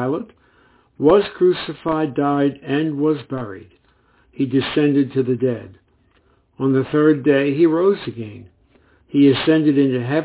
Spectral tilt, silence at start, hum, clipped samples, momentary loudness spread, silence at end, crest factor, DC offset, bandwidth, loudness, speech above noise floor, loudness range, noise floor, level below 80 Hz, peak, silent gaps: -11.5 dB/octave; 0 s; none; under 0.1%; 14 LU; 0 s; 16 dB; under 0.1%; 4 kHz; -18 LUFS; 41 dB; 5 LU; -58 dBFS; -56 dBFS; -2 dBFS; none